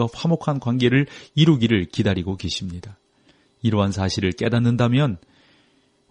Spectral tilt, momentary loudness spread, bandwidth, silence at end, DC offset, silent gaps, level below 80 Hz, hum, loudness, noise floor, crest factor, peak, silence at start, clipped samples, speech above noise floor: -6.5 dB/octave; 9 LU; 10 kHz; 0.95 s; under 0.1%; none; -50 dBFS; none; -21 LUFS; -61 dBFS; 18 dB; -4 dBFS; 0 s; under 0.1%; 41 dB